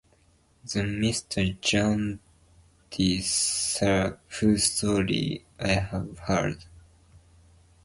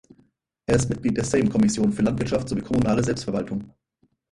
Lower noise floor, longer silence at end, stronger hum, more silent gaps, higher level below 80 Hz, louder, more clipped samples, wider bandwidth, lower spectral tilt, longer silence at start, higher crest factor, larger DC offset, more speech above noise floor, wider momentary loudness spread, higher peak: second, -62 dBFS vs -68 dBFS; about the same, 0.65 s vs 0.65 s; neither; neither; about the same, -46 dBFS vs -44 dBFS; second, -26 LUFS vs -23 LUFS; neither; about the same, 11.5 kHz vs 11.5 kHz; second, -4 dB/octave vs -6 dB/octave; about the same, 0.65 s vs 0.7 s; about the same, 22 dB vs 18 dB; neither; second, 36 dB vs 46 dB; first, 10 LU vs 7 LU; about the same, -6 dBFS vs -6 dBFS